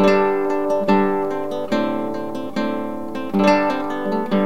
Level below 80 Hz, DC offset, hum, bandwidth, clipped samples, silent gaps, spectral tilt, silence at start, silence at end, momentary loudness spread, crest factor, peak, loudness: -60 dBFS; 2%; none; 16 kHz; under 0.1%; none; -7 dB/octave; 0 s; 0 s; 10 LU; 16 dB; -2 dBFS; -20 LUFS